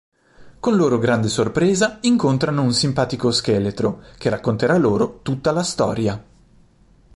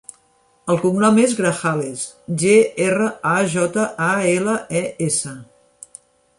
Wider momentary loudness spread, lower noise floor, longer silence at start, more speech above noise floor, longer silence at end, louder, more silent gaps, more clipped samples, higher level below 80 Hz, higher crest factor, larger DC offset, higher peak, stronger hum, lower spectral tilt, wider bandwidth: second, 7 LU vs 11 LU; second, -53 dBFS vs -59 dBFS; second, 0.4 s vs 0.65 s; second, 34 dB vs 41 dB; about the same, 0.95 s vs 0.95 s; about the same, -19 LUFS vs -18 LUFS; neither; neither; first, -48 dBFS vs -60 dBFS; about the same, 16 dB vs 18 dB; neither; about the same, -4 dBFS vs -2 dBFS; neither; about the same, -5.5 dB/octave vs -5 dB/octave; about the same, 11.5 kHz vs 11.5 kHz